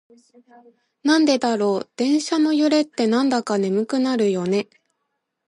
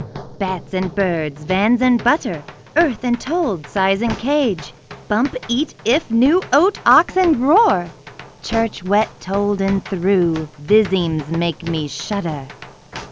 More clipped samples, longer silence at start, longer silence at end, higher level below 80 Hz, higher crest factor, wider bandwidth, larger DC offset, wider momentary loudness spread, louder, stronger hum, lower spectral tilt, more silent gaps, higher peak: neither; first, 1.05 s vs 0 s; first, 0.85 s vs 0 s; second, -72 dBFS vs -44 dBFS; about the same, 16 dB vs 18 dB; first, 11.5 kHz vs 8 kHz; neither; second, 6 LU vs 13 LU; about the same, -20 LUFS vs -18 LUFS; neither; about the same, -5 dB/octave vs -5.5 dB/octave; neither; second, -4 dBFS vs 0 dBFS